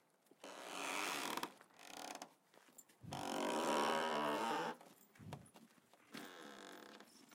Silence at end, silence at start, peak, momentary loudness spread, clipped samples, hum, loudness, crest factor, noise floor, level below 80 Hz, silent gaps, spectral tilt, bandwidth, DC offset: 0 s; 0.45 s; -26 dBFS; 22 LU; under 0.1%; none; -43 LUFS; 20 dB; -69 dBFS; -86 dBFS; none; -3 dB/octave; 16.5 kHz; under 0.1%